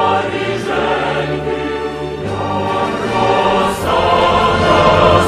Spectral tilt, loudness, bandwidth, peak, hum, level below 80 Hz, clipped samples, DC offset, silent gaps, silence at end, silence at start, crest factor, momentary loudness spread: -5.5 dB/octave; -15 LUFS; 15 kHz; 0 dBFS; none; -34 dBFS; under 0.1%; under 0.1%; none; 0 s; 0 s; 14 dB; 10 LU